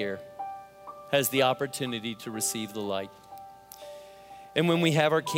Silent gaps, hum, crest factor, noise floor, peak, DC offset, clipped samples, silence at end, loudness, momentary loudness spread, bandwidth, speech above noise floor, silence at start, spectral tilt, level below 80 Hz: none; none; 22 dB; -48 dBFS; -8 dBFS; under 0.1%; under 0.1%; 0 s; -28 LUFS; 23 LU; 16 kHz; 21 dB; 0 s; -4 dB/octave; -72 dBFS